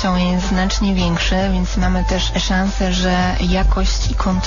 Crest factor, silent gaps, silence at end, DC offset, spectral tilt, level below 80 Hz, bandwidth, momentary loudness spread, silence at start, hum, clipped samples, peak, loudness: 10 dB; none; 0 s; 0.6%; -5 dB/octave; -20 dBFS; 7.4 kHz; 2 LU; 0 s; none; under 0.1%; -6 dBFS; -17 LUFS